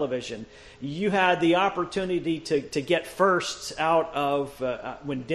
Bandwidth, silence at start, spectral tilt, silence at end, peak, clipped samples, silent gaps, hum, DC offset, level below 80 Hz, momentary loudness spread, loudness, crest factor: 13 kHz; 0 s; -5 dB/octave; 0 s; -8 dBFS; under 0.1%; none; none; under 0.1%; -56 dBFS; 12 LU; -26 LUFS; 18 dB